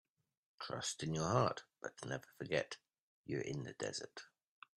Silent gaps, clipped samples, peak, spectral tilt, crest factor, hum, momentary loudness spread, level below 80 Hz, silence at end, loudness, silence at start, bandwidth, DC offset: 3.00-3.24 s; under 0.1%; -20 dBFS; -4.5 dB/octave; 24 dB; none; 16 LU; -72 dBFS; 0.55 s; -42 LUFS; 0.6 s; 13 kHz; under 0.1%